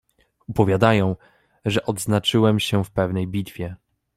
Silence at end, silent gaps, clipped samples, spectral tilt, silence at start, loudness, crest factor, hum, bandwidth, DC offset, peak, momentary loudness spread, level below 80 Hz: 0.4 s; none; under 0.1%; -6 dB/octave; 0.5 s; -21 LUFS; 20 dB; none; 15 kHz; under 0.1%; -2 dBFS; 13 LU; -50 dBFS